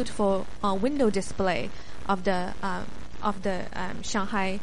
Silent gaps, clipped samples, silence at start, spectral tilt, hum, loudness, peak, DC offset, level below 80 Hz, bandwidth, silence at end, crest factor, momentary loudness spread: none; under 0.1%; 0 s; -5 dB/octave; none; -29 LUFS; -10 dBFS; 3%; -44 dBFS; 11.5 kHz; 0 s; 16 dB; 9 LU